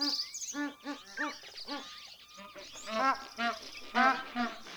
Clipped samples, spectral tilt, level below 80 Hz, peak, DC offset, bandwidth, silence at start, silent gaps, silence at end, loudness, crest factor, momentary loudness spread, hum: under 0.1%; -1 dB/octave; -72 dBFS; -14 dBFS; under 0.1%; over 20 kHz; 0 s; none; 0 s; -34 LUFS; 22 dB; 19 LU; none